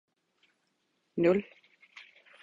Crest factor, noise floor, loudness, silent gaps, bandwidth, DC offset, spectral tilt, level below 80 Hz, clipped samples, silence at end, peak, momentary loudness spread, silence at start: 22 dB; -77 dBFS; -29 LUFS; none; 7.6 kHz; under 0.1%; -8.5 dB/octave; -70 dBFS; under 0.1%; 0.4 s; -14 dBFS; 25 LU; 1.15 s